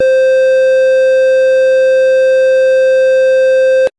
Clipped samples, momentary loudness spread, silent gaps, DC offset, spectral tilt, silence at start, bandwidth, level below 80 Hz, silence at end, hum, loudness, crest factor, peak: under 0.1%; 0 LU; none; under 0.1%; -1.5 dB/octave; 0 s; 9.4 kHz; -54 dBFS; 0.1 s; none; -9 LUFS; 4 dB; -6 dBFS